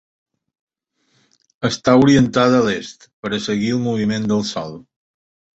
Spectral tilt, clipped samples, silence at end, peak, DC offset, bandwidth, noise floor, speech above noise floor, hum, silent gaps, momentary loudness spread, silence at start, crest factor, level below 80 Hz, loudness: -5.5 dB/octave; under 0.1%; 0.8 s; -2 dBFS; under 0.1%; 8 kHz; -66 dBFS; 50 dB; none; 3.13-3.23 s; 15 LU; 1.6 s; 18 dB; -50 dBFS; -17 LUFS